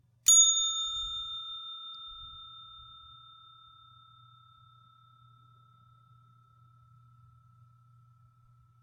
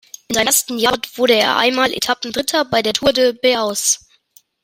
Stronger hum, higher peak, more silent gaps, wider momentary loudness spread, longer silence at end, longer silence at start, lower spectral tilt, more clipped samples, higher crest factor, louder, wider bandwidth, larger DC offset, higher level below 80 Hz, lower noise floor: neither; second, -10 dBFS vs -2 dBFS; neither; first, 30 LU vs 5 LU; first, 6 s vs 0.65 s; about the same, 0.25 s vs 0.3 s; second, 3 dB/octave vs -1.5 dB/octave; neither; first, 24 dB vs 16 dB; second, -25 LUFS vs -16 LUFS; about the same, 17 kHz vs 16.5 kHz; neither; second, -66 dBFS vs -50 dBFS; first, -63 dBFS vs -53 dBFS